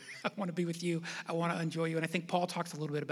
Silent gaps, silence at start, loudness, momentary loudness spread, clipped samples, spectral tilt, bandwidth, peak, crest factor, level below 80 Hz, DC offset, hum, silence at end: none; 0 s; -36 LUFS; 4 LU; under 0.1%; -5.5 dB/octave; 14 kHz; -16 dBFS; 20 dB; under -90 dBFS; under 0.1%; none; 0 s